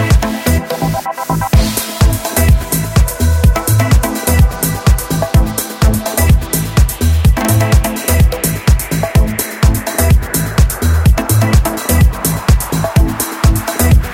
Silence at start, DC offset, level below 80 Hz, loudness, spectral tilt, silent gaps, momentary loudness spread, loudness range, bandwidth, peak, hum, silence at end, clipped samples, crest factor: 0 s; under 0.1%; -14 dBFS; -13 LUFS; -5 dB/octave; none; 4 LU; 1 LU; 17 kHz; 0 dBFS; none; 0 s; under 0.1%; 12 dB